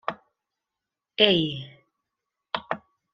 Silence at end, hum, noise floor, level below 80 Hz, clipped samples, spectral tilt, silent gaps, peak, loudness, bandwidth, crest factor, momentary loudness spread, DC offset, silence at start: 0.35 s; none; -87 dBFS; -62 dBFS; under 0.1%; -6.5 dB/octave; none; -2 dBFS; -24 LUFS; 7.2 kHz; 28 dB; 18 LU; under 0.1%; 0.1 s